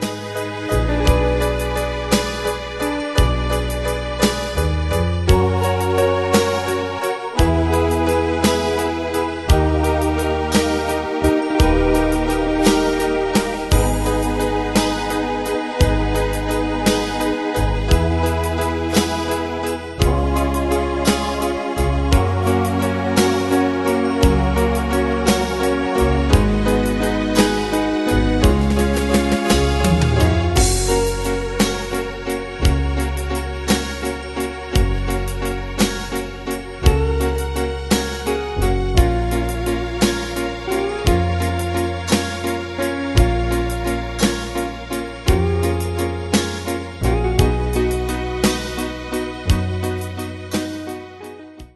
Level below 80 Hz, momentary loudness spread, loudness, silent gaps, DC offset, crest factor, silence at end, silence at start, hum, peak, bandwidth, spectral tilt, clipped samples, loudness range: -24 dBFS; 8 LU; -19 LUFS; none; under 0.1%; 18 dB; 0.1 s; 0 s; none; 0 dBFS; 12.5 kHz; -5.5 dB/octave; under 0.1%; 4 LU